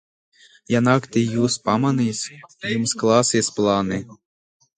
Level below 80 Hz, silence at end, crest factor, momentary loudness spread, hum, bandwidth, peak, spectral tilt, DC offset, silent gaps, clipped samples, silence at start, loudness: -56 dBFS; 0.65 s; 20 dB; 10 LU; none; 9.6 kHz; -2 dBFS; -4.5 dB/octave; under 0.1%; none; under 0.1%; 0.7 s; -20 LUFS